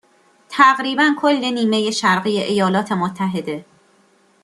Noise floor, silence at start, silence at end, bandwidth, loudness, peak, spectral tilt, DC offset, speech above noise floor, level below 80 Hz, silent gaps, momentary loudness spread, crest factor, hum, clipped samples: -56 dBFS; 0.5 s; 0.8 s; 12.5 kHz; -17 LUFS; -2 dBFS; -4.5 dB/octave; under 0.1%; 39 dB; -64 dBFS; none; 11 LU; 18 dB; none; under 0.1%